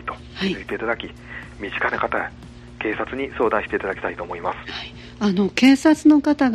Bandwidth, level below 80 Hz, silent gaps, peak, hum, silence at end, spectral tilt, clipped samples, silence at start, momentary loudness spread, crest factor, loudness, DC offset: 12 kHz; -46 dBFS; none; -2 dBFS; 60 Hz at -45 dBFS; 0 s; -5.5 dB/octave; under 0.1%; 0 s; 18 LU; 20 dB; -21 LUFS; under 0.1%